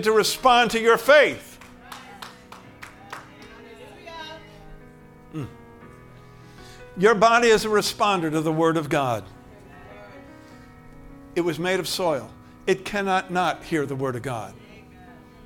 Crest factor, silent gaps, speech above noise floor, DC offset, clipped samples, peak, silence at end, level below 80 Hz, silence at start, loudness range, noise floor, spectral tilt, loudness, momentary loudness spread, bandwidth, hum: 22 dB; none; 26 dB; under 0.1%; under 0.1%; -2 dBFS; 0.35 s; -52 dBFS; 0 s; 20 LU; -47 dBFS; -4 dB/octave; -21 LUFS; 27 LU; 18 kHz; none